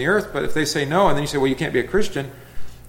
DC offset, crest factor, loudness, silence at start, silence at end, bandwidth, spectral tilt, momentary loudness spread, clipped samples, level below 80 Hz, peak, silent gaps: under 0.1%; 16 dB; -21 LUFS; 0 s; 0 s; 17 kHz; -5 dB/octave; 8 LU; under 0.1%; -40 dBFS; -4 dBFS; none